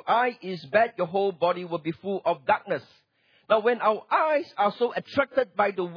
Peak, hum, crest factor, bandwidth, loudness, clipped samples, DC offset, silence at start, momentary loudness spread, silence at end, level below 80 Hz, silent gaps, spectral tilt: -8 dBFS; none; 16 dB; 5.4 kHz; -26 LUFS; under 0.1%; under 0.1%; 0.05 s; 8 LU; 0 s; -72 dBFS; none; -7 dB/octave